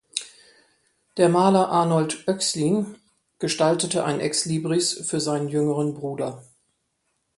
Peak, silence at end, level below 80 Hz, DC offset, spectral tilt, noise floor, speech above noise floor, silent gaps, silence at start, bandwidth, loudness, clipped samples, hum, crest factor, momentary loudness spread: -2 dBFS; 0.95 s; -66 dBFS; under 0.1%; -4.5 dB/octave; -74 dBFS; 52 dB; none; 0.15 s; 11.5 kHz; -23 LUFS; under 0.1%; none; 22 dB; 13 LU